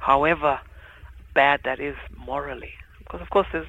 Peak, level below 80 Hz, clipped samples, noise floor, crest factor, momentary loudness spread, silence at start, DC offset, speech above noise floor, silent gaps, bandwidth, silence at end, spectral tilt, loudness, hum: -4 dBFS; -44 dBFS; under 0.1%; -44 dBFS; 22 dB; 20 LU; 0 s; under 0.1%; 21 dB; none; 8.8 kHz; 0 s; -6.5 dB/octave; -23 LUFS; none